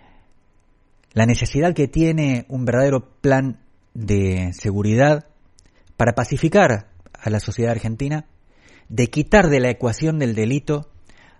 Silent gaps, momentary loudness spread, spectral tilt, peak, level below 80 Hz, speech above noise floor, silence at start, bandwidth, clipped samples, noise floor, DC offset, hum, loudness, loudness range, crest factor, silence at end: none; 10 LU; -6.5 dB/octave; 0 dBFS; -38 dBFS; 38 dB; 1.15 s; 11.5 kHz; under 0.1%; -56 dBFS; under 0.1%; none; -19 LUFS; 2 LU; 20 dB; 0.55 s